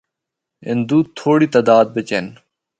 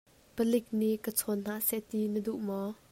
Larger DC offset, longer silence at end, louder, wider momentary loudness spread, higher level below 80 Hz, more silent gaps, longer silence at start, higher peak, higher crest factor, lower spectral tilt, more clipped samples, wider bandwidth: neither; first, 0.5 s vs 0.2 s; first, -16 LUFS vs -32 LUFS; first, 12 LU vs 6 LU; first, -60 dBFS vs -68 dBFS; neither; first, 0.65 s vs 0.35 s; first, 0 dBFS vs -14 dBFS; about the same, 16 dB vs 18 dB; first, -7 dB/octave vs -5 dB/octave; neither; second, 9 kHz vs 16 kHz